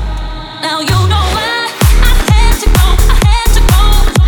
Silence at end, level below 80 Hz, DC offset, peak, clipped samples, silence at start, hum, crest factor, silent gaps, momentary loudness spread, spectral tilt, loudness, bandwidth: 0 s; -10 dBFS; under 0.1%; 0 dBFS; under 0.1%; 0 s; none; 8 dB; none; 8 LU; -4.5 dB/octave; -11 LUFS; 19.5 kHz